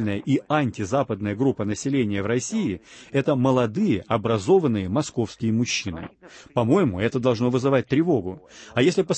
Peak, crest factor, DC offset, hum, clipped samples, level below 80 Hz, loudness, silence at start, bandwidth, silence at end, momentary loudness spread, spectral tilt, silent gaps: -6 dBFS; 16 dB; under 0.1%; none; under 0.1%; -54 dBFS; -23 LUFS; 0 s; 8.8 kHz; 0 s; 8 LU; -6 dB/octave; none